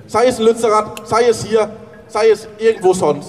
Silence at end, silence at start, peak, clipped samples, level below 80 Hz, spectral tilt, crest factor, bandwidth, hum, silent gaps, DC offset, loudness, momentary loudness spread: 0 s; 0.05 s; -2 dBFS; under 0.1%; -50 dBFS; -4.5 dB/octave; 12 dB; 13.5 kHz; none; none; 0.1%; -15 LUFS; 5 LU